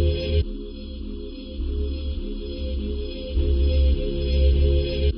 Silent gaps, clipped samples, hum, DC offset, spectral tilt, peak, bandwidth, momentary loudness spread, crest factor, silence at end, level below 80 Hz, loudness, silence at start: none; under 0.1%; none; under 0.1%; -7.5 dB/octave; -10 dBFS; 5.4 kHz; 14 LU; 14 dB; 0 s; -24 dBFS; -25 LUFS; 0 s